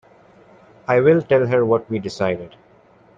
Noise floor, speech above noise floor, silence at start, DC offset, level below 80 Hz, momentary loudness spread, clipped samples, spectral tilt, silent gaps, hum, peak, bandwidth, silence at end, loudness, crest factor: -52 dBFS; 34 dB; 0.9 s; under 0.1%; -58 dBFS; 12 LU; under 0.1%; -7.5 dB/octave; none; none; -4 dBFS; 7.6 kHz; 0.7 s; -18 LUFS; 16 dB